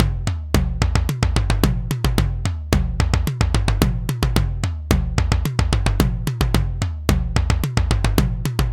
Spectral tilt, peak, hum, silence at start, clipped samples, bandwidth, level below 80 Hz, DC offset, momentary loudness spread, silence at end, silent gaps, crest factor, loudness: -5.5 dB/octave; 0 dBFS; none; 0 s; under 0.1%; 17 kHz; -22 dBFS; under 0.1%; 3 LU; 0 s; none; 18 dB; -21 LUFS